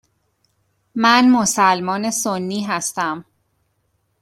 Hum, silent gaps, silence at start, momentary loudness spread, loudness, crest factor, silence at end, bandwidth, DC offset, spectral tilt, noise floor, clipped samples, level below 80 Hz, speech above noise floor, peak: none; none; 0.95 s; 11 LU; -17 LUFS; 18 dB; 1 s; 15 kHz; under 0.1%; -3 dB/octave; -67 dBFS; under 0.1%; -62 dBFS; 50 dB; -2 dBFS